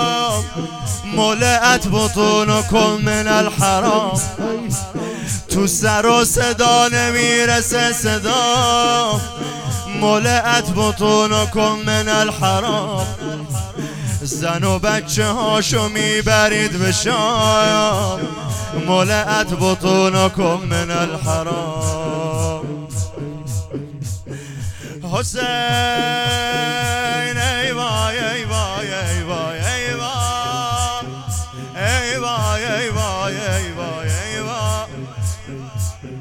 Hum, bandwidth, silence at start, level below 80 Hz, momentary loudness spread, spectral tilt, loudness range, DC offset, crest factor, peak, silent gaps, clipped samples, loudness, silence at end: none; 17.5 kHz; 0 s; -40 dBFS; 12 LU; -3.5 dB/octave; 7 LU; under 0.1%; 18 dB; 0 dBFS; none; under 0.1%; -17 LUFS; 0 s